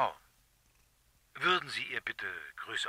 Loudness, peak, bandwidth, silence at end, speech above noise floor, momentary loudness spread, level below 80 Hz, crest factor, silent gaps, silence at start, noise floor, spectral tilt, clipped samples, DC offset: -34 LUFS; -14 dBFS; 16 kHz; 0 s; 34 dB; 17 LU; -72 dBFS; 24 dB; none; 0 s; -69 dBFS; -2.5 dB/octave; under 0.1%; under 0.1%